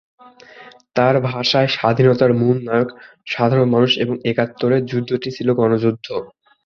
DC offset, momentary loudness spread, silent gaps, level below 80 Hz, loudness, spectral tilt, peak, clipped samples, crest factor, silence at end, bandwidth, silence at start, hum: under 0.1%; 10 LU; none; -56 dBFS; -17 LUFS; -7 dB/octave; -2 dBFS; under 0.1%; 16 dB; 0.4 s; 7 kHz; 0.55 s; none